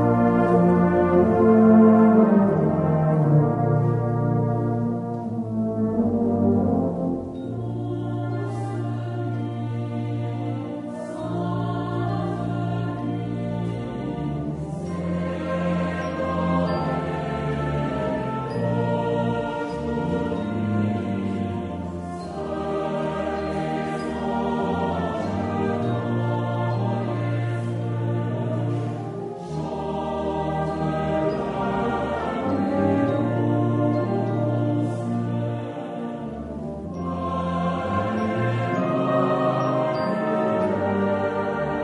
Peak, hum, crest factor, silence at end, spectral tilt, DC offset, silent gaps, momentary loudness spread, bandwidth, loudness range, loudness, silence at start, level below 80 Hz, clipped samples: -4 dBFS; none; 18 dB; 0 s; -9 dB/octave; under 0.1%; none; 11 LU; 10.5 kHz; 8 LU; -24 LUFS; 0 s; -48 dBFS; under 0.1%